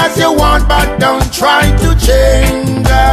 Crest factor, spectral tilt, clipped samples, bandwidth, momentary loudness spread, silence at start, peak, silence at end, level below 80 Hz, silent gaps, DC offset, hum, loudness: 8 dB; -4.5 dB/octave; under 0.1%; 14.5 kHz; 3 LU; 0 s; 0 dBFS; 0 s; -14 dBFS; none; under 0.1%; none; -10 LUFS